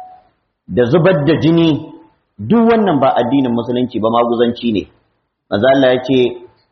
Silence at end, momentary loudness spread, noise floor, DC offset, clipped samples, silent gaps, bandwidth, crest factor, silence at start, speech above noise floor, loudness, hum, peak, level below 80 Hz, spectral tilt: 0.25 s; 9 LU; -64 dBFS; under 0.1%; under 0.1%; none; 6.2 kHz; 14 dB; 0 s; 52 dB; -14 LUFS; none; 0 dBFS; -50 dBFS; -5.5 dB/octave